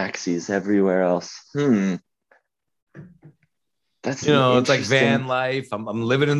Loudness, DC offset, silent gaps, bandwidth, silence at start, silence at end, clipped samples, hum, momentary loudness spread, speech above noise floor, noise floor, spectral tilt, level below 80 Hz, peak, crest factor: -21 LUFS; under 0.1%; 2.82-2.87 s; 11.5 kHz; 0 s; 0 s; under 0.1%; none; 11 LU; 59 dB; -80 dBFS; -5.5 dB/octave; -62 dBFS; -4 dBFS; 18 dB